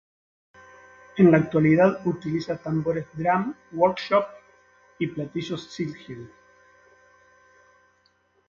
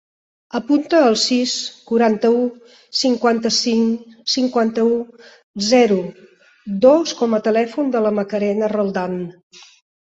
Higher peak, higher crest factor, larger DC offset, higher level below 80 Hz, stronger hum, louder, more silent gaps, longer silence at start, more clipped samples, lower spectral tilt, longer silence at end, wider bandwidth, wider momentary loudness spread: about the same, -4 dBFS vs -2 dBFS; about the same, 20 dB vs 16 dB; neither; about the same, -62 dBFS vs -62 dBFS; neither; second, -24 LUFS vs -18 LUFS; second, none vs 5.43-5.54 s; first, 1.15 s vs 0.55 s; neither; first, -8 dB/octave vs -4 dB/octave; first, 2.25 s vs 0.8 s; second, 7.2 kHz vs 8.2 kHz; first, 15 LU vs 12 LU